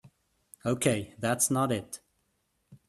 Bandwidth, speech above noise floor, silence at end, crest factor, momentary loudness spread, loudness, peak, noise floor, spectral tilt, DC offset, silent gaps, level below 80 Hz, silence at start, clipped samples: 15 kHz; 47 dB; 0.15 s; 22 dB; 14 LU; -29 LUFS; -10 dBFS; -76 dBFS; -4.5 dB/octave; under 0.1%; none; -64 dBFS; 0.65 s; under 0.1%